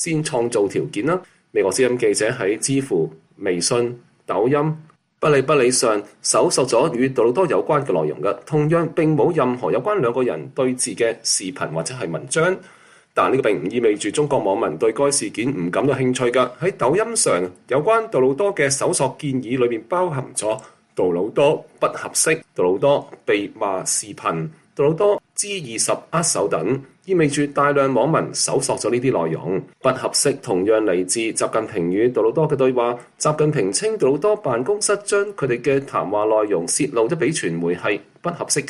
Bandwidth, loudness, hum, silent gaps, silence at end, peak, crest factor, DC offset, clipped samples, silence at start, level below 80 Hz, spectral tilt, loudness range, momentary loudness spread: 12.5 kHz; -20 LUFS; none; none; 0 s; -2 dBFS; 16 dB; under 0.1%; under 0.1%; 0 s; -60 dBFS; -4 dB/octave; 2 LU; 6 LU